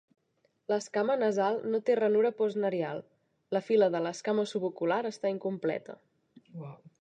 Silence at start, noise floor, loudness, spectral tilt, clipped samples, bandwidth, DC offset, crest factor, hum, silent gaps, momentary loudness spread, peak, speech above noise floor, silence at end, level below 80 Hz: 0.7 s; -74 dBFS; -30 LUFS; -5.5 dB/octave; under 0.1%; 9.2 kHz; under 0.1%; 16 dB; none; none; 19 LU; -14 dBFS; 44 dB; 0.25 s; -86 dBFS